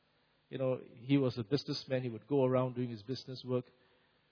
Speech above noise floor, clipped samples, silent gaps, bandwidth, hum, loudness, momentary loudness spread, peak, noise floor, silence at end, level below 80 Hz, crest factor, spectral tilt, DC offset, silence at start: 38 dB; under 0.1%; none; 5.4 kHz; none; -36 LUFS; 11 LU; -18 dBFS; -73 dBFS; 0.7 s; -76 dBFS; 18 dB; -6.5 dB/octave; under 0.1%; 0.5 s